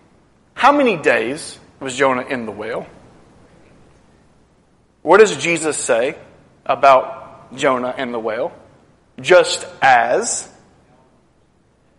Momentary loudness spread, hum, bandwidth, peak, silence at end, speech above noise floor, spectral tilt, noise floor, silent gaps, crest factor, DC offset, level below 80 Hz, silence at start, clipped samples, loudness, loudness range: 18 LU; none; 11.5 kHz; 0 dBFS; 1.5 s; 41 dB; -3 dB/octave; -56 dBFS; none; 18 dB; under 0.1%; -58 dBFS; 0.55 s; under 0.1%; -16 LUFS; 8 LU